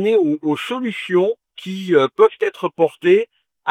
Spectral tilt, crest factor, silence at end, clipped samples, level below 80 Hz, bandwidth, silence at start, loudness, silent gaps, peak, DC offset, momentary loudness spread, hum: -6.5 dB/octave; 16 dB; 0 s; under 0.1%; -72 dBFS; 12.5 kHz; 0 s; -18 LUFS; none; -2 dBFS; under 0.1%; 13 LU; none